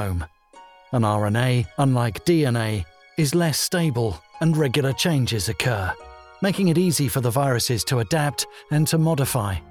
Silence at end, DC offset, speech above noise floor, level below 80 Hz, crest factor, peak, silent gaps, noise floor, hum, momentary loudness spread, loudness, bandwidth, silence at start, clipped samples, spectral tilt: 0 s; under 0.1%; 28 dB; -46 dBFS; 16 dB; -6 dBFS; none; -49 dBFS; none; 8 LU; -22 LUFS; 19.5 kHz; 0 s; under 0.1%; -5 dB/octave